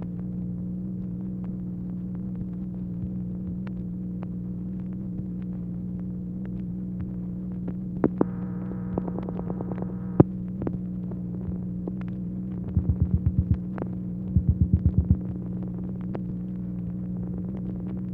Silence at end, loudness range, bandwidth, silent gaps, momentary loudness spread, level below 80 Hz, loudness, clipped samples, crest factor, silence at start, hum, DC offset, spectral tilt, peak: 0 s; 7 LU; 3 kHz; none; 9 LU; -38 dBFS; -30 LUFS; under 0.1%; 28 dB; 0 s; 60 Hz at -45 dBFS; under 0.1%; -13 dB/octave; -2 dBFS